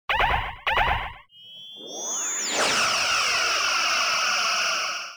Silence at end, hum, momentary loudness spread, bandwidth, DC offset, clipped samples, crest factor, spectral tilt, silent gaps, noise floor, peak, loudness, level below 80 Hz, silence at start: 0 s; none; 13 LU; over 20 kHz; under 0.1%; under 0.1%; 16 dB; 0 dB/octave; none; -45 dBFS; -10 dBFS; -22 LUFS; -42 dBFS; 0.1 s